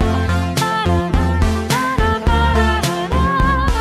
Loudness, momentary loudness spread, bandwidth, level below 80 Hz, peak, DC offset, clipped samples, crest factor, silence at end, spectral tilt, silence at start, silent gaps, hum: -17 LUFS; 3 LU; 15 kHz; -20 dBFS; -2 dBFS; under 0.1%; under 0.1%; 12 dB; 0 s; -5.5 dB/octave; 0 s; none; none